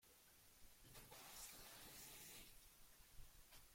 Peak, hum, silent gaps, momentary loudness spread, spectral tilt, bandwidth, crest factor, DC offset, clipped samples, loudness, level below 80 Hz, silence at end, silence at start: -44 dBFS; none; none; 11 LU; -1.5 dB/octave; 16.5 kHz; 18 dB; under 0.1%; under 0.1%; -61 LUFS; -72 dBFS; 0 s; 0 s